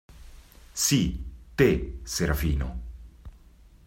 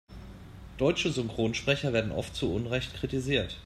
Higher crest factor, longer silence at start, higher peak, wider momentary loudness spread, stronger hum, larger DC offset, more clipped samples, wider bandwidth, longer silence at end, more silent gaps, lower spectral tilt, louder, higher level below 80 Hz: about the same, 20 dB vs 20 dB; about the same, 0.1 s vs 0.1 s; about the same, -8 dBFS vs -10 dBFS; second, 17 LU vs 20 LU; neither; neither; neither; first, 16.5 kHz vs 14 kHz; first, 0.5 s vs 0 s; neither; about the same, -4.5 dB/octave vs -5 dB/octave; first, -26 LUFS vs -30 LUFS; first, -36 dBFS vs -48 dBFS